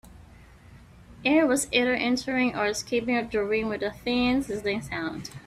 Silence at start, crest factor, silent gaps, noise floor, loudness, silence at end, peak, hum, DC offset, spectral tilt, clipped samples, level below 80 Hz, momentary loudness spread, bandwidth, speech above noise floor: 0.05 s; 18 dB; none; -50 dBFS; -26 LUFS; 0.05 s; -8 dBFS; none; under 0.1%; -3.5 dB/octave; under 0.1%; -52 dBFS; 8 LU; 14.5 kHz; 24 dB